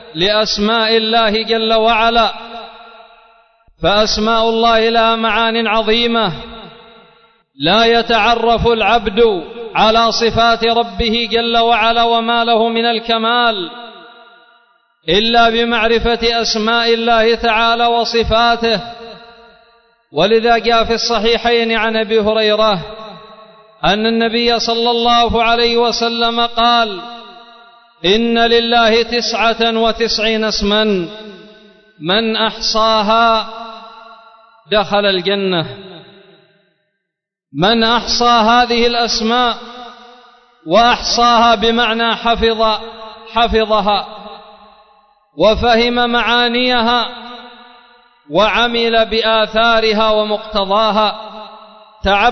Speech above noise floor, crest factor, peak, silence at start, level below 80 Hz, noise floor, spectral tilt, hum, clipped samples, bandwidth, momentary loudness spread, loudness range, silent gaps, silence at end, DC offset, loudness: 65 dB; 12 dB; -2 dBFS; 0 s; -36 dBFS; -78 dBFS; -3.5 dB/octave; none; under 0.1%; 6.4 kHz; 13 LU; 3 LU; none; 0 s; under 0.1%; -13 LUFS